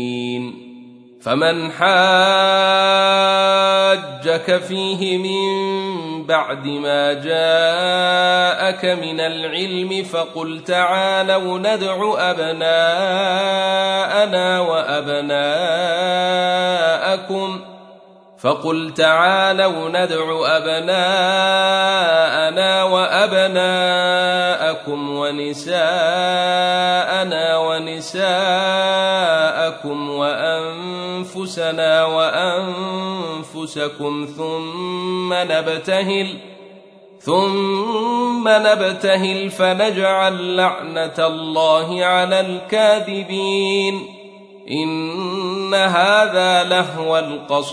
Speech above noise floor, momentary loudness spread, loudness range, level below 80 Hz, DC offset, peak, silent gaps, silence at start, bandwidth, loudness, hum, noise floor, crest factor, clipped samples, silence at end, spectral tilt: 28 dB; 10 LU; 5 LU; -72 dBFS; under 0.1%; -2 dBFS; none; 0 s; 11 kHz; -17 LUFS; none; -45 dBFS; 16 dB; under 0.1%; 0 s; -4 dB/octave